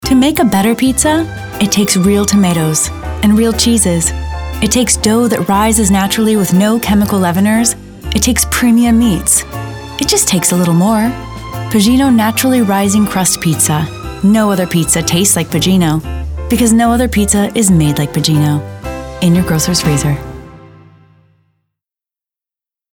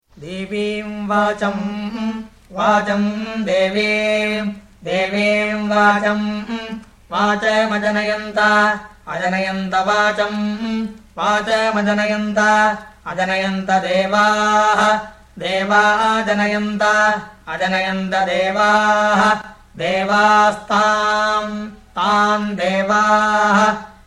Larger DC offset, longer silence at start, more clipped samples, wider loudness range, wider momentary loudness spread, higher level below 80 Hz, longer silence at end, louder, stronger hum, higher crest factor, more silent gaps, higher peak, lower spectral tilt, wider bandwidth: neither; second, 0 s vs 0.15 s; neither; about the same, 3 LU vs 3 LU; second, 8 LU vs 12 LU; first, -30 dBFS vs -50 dBFS; first, 2.35 s vs 0.15 s; first, -11 LUFS vs -17 LUFS; neither; about the same, 12 dB vs 16 dB; neither; about the same, 0 dBFS vs -2 dBFS; about the same, -4.5 dB/octave vs -4.5 dB/octave; first, over 20 kHz vs 11.5 kHz